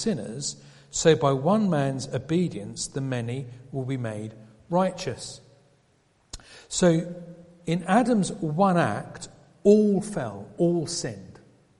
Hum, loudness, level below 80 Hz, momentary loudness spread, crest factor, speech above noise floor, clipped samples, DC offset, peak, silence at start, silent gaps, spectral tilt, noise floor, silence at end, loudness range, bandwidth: none; -25 LUFS; -56 dBFS; 21 LU; 22 dB; 40 dB; under 0.1%; under 0.1%; -4 dBFS; 0 s; none; -5.5 dB/octave; -64 dBFS; 0.45 s; 7 LU; 11.5 kHz